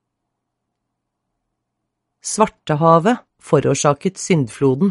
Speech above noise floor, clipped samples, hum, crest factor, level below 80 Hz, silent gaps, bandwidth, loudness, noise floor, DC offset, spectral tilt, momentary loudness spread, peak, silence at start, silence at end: 61 dB; under 0.1%; none; 20 dB; -56 dBFS; none; 11.5 kHz; -17 LUFS; -77 dBFS; under 0.1%; -5.5 dB/octave; 10 LU; 0 dBFS; 2.25 s; 0 s